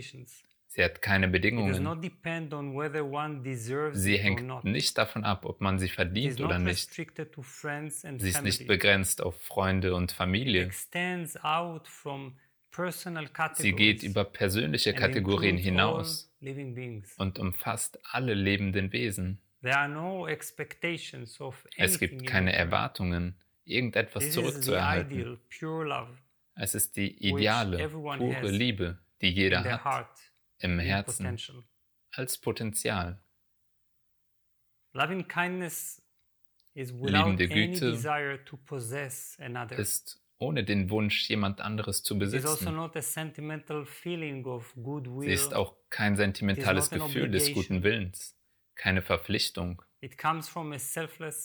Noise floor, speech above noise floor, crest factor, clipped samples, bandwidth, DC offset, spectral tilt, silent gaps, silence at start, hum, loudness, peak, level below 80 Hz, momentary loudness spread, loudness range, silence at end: -73 dBFS; 43 dB; 24 dB; under 0.1%; over 20 kHz; under 0.1%; -4 dB/octave; none; 0 s; none; -30 LUFS; -8 dBFS; -56 dBFS; 14 LU; 5 LU; 0 s